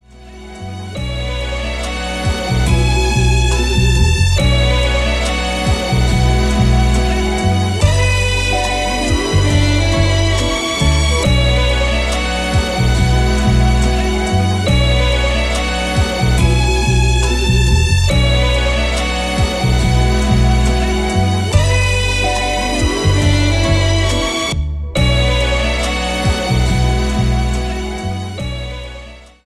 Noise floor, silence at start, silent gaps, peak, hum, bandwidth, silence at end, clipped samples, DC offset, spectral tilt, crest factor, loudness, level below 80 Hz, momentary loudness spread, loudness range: -35 dBFS; 0.15 s; none; 0 dBFS; none; 12.5 kHz; 0.25 s; under 0.1%; 0.2%; -5 dB/octave; 14 dB; -15 LUFS; -18 dBFS; 8 LU; 2 LU